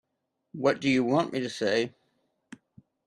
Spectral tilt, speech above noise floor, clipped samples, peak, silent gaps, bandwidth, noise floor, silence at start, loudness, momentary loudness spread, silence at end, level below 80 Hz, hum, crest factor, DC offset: -5.5 dB/octave; 54 dB; under 0.1%; -10 dBFS; none; 11 kHz; -81 dBFS; 0.55 s; -27 LUFS; 9 LU; 1.15 s; -70 dBFS; none; 18 dB; under 0.1%